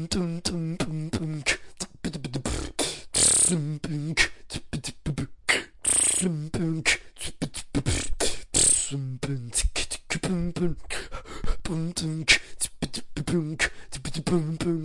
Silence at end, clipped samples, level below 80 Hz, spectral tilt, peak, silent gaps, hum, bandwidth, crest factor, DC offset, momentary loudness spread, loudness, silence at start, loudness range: 0 s; under 0.1%; -40 dBFS; -2.5 dB/octave; -4 dBFS; none; none; 11.5 kHz; 24 dB; under 0.1%; 15 LU; -26 LUFS; 0 s; 3 LU